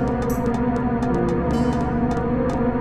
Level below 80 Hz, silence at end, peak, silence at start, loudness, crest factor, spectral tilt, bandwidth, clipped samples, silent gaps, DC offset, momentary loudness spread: -32 dBFS; 0 s; -10 dBFS; 0 s; -22 LUFS; 12 dB; -8 dB/octave; 14 kHz; under 0.1%; none; under 0.1%; 1 LU